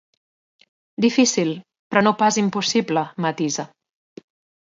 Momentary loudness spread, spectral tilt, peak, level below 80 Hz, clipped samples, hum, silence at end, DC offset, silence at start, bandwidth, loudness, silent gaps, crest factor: 12 LU; -4 dB/octave; 0 dBFS; -68 dBFS; under 0.1%; none; 1.05 s; under 0.1%; 1 s; 7.8 kHz; -20 LUFS; 1.79-1.90 s; 22 dB